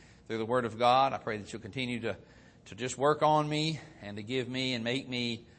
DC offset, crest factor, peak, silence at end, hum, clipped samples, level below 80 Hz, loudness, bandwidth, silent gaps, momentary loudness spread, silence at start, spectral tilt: under 0.1%; 20 dB; -12 dBFS; 0.15 s; none; under 0.1%; -66 dBFS; -31 LUFS; 8.8 kHz; none; 15 LU; 0.3 s; -5 dB/octave